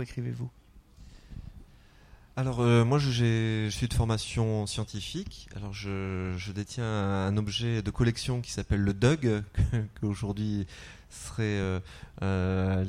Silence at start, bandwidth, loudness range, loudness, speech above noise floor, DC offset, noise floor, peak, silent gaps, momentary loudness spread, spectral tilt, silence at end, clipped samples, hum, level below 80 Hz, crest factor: 0 s; 12 kHz; 5 LU; -30 LUFS; 26 dB; under 0.1%; -55 dBFS; -8 dBFS; none; 16 LU; -6 dB/octave; 0 s; under 0.1%; none; -44 dBFS; 20 dB